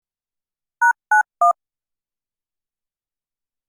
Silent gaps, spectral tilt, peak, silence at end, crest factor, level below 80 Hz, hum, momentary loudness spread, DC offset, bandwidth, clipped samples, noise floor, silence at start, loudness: none; 0.5 dB/octave; -6 dBFS; 2.2 s; 18 dB; -88 dBFS; none; 4 LU; under 0.1%; 18.5 kHz; under 0.1%; under -90 dBFS; 0.8 s; -18 LUFS